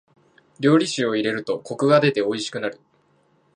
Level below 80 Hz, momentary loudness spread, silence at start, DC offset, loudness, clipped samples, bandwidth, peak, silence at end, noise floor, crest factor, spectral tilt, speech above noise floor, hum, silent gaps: -70 dBFS; 11 LU; 0.6 s; under 0.1%; -21 LUFS; under 0.1%; 11 kHz; -4 dBFS; 0.8 s; -62 dBFS; 18 dB; -5.5 dB/octave; 41 dB; none; none